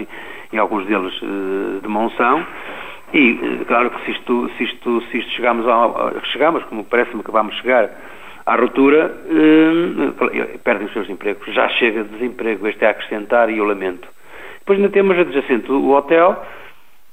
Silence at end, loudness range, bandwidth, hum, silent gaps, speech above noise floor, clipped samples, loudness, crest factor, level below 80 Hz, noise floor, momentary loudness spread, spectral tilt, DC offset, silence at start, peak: 0.45 s; 3 LU; 15.5 kHz; none; none; 21 dB; under 0.1%; -17 LUFS; 16 dB; -54 dBFS; -38 dBFS; 11 LU; -6 dB/octave; 1%; 0 s; 0 dBFS